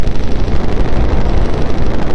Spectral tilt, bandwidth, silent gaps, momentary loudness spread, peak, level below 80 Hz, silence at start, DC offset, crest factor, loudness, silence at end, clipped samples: -7.5 dB/octave; 6.4 kHz; none; 3 LU; -2 dBFS; -16 dBFS; 0 s; under 0.1%; 8 dB; -18 LUFS; 0 s; under 0.1%